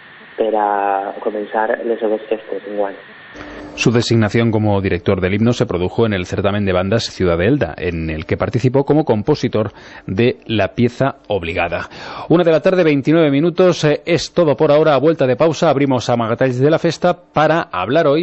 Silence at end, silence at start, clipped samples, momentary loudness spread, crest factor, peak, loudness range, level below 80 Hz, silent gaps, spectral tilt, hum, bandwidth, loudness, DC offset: 0 s; 0.2 s; under 0.1%; 10 LU; 14 dB; -2 dBFS; 5 LU; -44 dBFS; none; -6.5 dB/octave; none; 8.4 kHz; -16 LUFS; under 0.1%